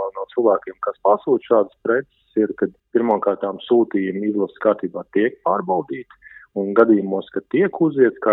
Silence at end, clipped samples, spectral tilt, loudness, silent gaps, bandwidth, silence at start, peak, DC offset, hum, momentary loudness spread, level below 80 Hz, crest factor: 0 s; under 0.1%; -10.5 dB/octave; -20 LUFS; none; 4 kHz; 0 s; 0 dBFS; under 0.1%; none; 9 LU; -68 dBFS; 20 dB